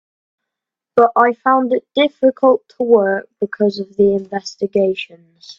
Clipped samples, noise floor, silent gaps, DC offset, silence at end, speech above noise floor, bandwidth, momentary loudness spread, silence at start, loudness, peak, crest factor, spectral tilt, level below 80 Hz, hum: under 0.1%; -83 dBFS; none; under 0.1%; 0.05 s; 68 dB; 7.4 kHz; 9 LU; 0.95 s; -16 LUFS; 0 dBFS; 16 dB; -6 dB/octave; -60 dBFS; none